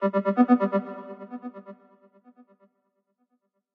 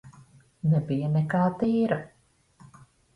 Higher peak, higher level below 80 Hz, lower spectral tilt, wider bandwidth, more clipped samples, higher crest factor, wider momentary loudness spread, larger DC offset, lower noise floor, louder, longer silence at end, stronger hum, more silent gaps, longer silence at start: about the same, -8 dBFS vs -10 dBFS; second, under -90 dBFS vs -60 dBFS; about the same, -10 dB/octave vs -9.5 dB/octave; second, 4.5 kHz vs 10.5 kHz; neither; about the same, 20 dB vs 18 dB; first, 20 LU vs 5 LU; neither; first, -75 dBFS vs -60 dBFS; first, -23 LUFS vs -26 LUFS; first, 2 s vs 0.5 s; neither; neither; about the same, 0 s vs 0.05 s